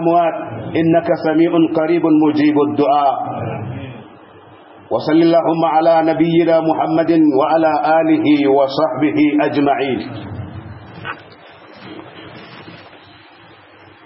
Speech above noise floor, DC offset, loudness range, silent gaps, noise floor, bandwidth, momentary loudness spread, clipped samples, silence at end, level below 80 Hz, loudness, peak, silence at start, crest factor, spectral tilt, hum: 29 dB; under 0.1%; 16 LU; none; -43 dBFS; 5.8 kHz; 21 LU; under 0.1%; 1.25 s; -56 dBFS; -14 LUFS; -2 dBFS; 0 s; 14 dB; -11.5 dB/octave; none